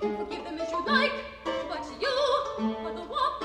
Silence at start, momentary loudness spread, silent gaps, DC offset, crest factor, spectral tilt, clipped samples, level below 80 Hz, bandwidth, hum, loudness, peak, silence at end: 0 s; 10 LU; none; under 0.1%; 18 dB; -4 dB/octave; under 0.1%; -56 dBFS; 11.5 kHz; none; -29 LUFS; -12 dBFS; 0 s